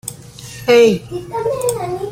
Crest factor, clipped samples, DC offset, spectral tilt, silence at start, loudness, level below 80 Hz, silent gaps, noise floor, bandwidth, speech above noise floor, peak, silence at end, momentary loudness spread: 16 dB; under 0.1%; under 0.1%; -4.5 dB/octave; 0.05 s; -16 LUFS; -48 dBFS; none; -34 dBFS; 16.5 kHz; 19 dB; -2 dBFS; 0 s; 20 LU